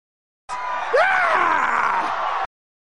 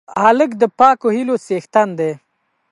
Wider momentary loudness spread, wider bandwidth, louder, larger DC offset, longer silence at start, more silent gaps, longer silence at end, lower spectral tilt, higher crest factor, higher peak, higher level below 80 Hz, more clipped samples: about the same, 12 LU vs 10 LU; about the same, 11.5 kHz vs 11.5 kHz; second, -20 LUFS vs -15 LUFS; first, 1% vs under 0.1%; first, 0.5 s vs 0.1 s; neither; about the same, 0.5 s vs 0.55 s; second, -2.5 dB/octave vs -6 dB/octave; about the same, 16 dB vs 16 dB; second, -6 dBFS vs 0 dBFS; first, -58 dBFS vs -64 dBFS; neither